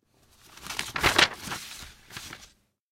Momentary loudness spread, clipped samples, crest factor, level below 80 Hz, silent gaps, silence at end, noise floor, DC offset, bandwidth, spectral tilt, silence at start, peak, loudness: 22 LU; under 0.1%; 28 dB; -50 dBFS; none; 0.45 s; -59 dBFS; under 0.1%; 16.5 kHz; -1.5 dB/octave; 0.5 s; -2 dBFS; -25 LUFS